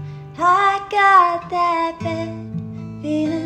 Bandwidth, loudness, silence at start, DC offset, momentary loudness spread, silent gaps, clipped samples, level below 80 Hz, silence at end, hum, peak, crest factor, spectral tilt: 10.5 kHz; -17 LUFS; 0 s; under 0.1%; 17 LU; none; under 0.1%; -54 dBFS; 0 s; none; -2 dBFS; 16 dB; -5.5 dB/octave